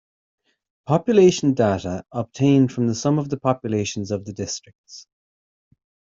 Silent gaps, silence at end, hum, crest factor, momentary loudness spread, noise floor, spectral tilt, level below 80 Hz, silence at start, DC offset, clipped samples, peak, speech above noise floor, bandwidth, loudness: 4.75-4.84 s; 1.1 s; none; 18 dB; 16 LU; under -90 dBFS; -6.5 dB/octave; -58 dBFS; 0.9 s; under 0.1%; under 0.1%; -4 dBFS; over 70 dB; 7.8 kHz; -21 LUFS